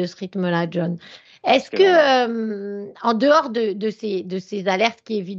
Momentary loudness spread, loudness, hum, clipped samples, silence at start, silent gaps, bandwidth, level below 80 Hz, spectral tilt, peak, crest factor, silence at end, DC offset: 12 LU; -20 LUFS; none; under 0.1%; 0 s; none; 7.6 kHz; -74 dBFS; -5.5 dB/octave; -2 dBFS; 18 dB; 0 s; under 0.1%